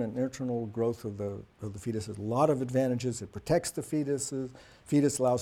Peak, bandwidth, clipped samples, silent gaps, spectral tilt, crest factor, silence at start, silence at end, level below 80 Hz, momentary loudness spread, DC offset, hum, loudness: -12 dBFS; 16.5 kHz; under 0.1%; none; -6 dB/octave; 18 dB; 0 s; 0 s; -60 dBFS; 11 LU; under 0.1%; none; -31 LUFS